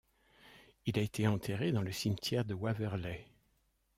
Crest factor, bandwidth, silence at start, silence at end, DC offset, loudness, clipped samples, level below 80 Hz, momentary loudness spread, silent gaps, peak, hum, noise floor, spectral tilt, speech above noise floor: 20 dB; 16 kHz; 0.45 s; 0.75 s; under 0.1%; -36 LUFS; under 0.1%; -64 dBFS; 8 LU; none; -18 dBFS; none; -76 dBFS; -6 dB/octave; 41 dB